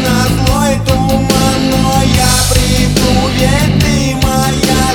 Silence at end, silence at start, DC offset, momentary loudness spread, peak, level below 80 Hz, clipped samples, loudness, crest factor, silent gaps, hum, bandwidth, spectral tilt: 0 s; 0 s; under 0.1%; 3 LU; 0 dBFS; -20 dBFS; under 0.1%; -11 LUFS; 10 dB; none; none; 19 kHz; -4.5 dB/octave